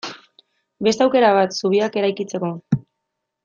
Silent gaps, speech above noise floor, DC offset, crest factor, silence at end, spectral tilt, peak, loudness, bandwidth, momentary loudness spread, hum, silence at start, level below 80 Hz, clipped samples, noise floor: none; 61 dB; under 0.1%; 18 dB; 0.65 s; -5.5 dB/octave; -4 dBFS; -19 LUFS; 7.6 kHz; 10 LU; none; 0.05 s; -64 dBFS; under 0.1%; -79 dBFS